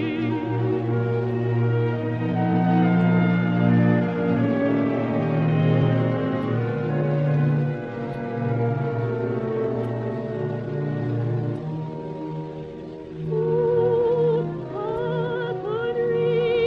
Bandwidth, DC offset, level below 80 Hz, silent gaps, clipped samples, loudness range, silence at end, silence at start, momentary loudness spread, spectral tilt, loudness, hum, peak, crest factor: 5.4 kHz; under 0.1%; -54 dBFS; none; under 0.1%; 6 LU; 0 s; 0 s; 10 LU; -10 dB/octave; -23 LUFS; none; -8 dBFS; 14 dB